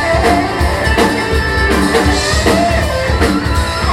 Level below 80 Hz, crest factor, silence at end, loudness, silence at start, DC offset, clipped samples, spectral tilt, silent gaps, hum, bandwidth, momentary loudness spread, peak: -20 dBFS; 12 dB; 0 s; -13 LUFS; 0 s; under 0.1%; under 0.1%; -5 dB/octave; none; none; 15.5 kHz; 3 LU; 0 dBFS